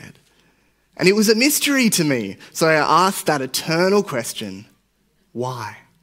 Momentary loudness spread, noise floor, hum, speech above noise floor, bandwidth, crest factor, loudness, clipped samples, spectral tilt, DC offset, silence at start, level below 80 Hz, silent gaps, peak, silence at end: 16 LU; -63 dBFS; none; 45 dB; 16 kHz; 20 dB; -18 LUFS; under 0.1%; -3.5 dB/octave; under 0.1%; 0.05 s; -64 dBFS; none; 0 dBFS; 0.25 s